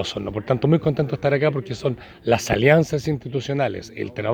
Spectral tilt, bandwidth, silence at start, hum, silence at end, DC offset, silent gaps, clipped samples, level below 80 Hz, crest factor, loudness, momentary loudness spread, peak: -6.5 dB/octave; 19.5 kHz; 0 s; none; 0 s; under 0.1%; none; under 0.1%; -48 dBFS; 20 dB; -22 LUFS; 11 LU; -2 dBFS